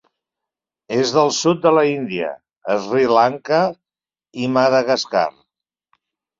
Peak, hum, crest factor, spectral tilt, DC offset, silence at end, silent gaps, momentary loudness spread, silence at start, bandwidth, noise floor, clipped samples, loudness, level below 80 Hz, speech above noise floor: -2 dBFS; none; 18 dB; -4.5 dB/octave; under 0.1%; 1.1 s; none; 10 LU; 0.9 s; 7.8 kHz; under -90 dBFS; under 0.1%; -18 LUFS; -64 dBFS; over 73 dB